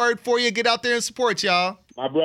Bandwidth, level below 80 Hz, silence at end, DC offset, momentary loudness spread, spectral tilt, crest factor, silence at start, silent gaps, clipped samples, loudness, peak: 15 kHz; -68 dBFS; 0 s; under 0.1%; 7 LU; -2.5 dB/octave; 16 dB; 0 s; none; under 0.1%; -21 LUFS; -4 dBFS